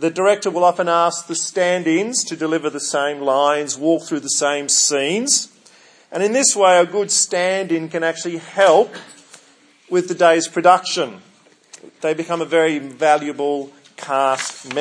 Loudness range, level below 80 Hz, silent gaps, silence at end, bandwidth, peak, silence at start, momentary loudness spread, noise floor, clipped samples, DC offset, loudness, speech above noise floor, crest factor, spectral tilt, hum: 3 LU; -78 dBFS; none; 0 s; 10.5 kHz; 0 dBFS; 0 s; 10 LU; -52 dBFS; under 0.1%; under 0.1%; -17 LUFS; 34 dB; 18 dB; -2.5 dB/octave; none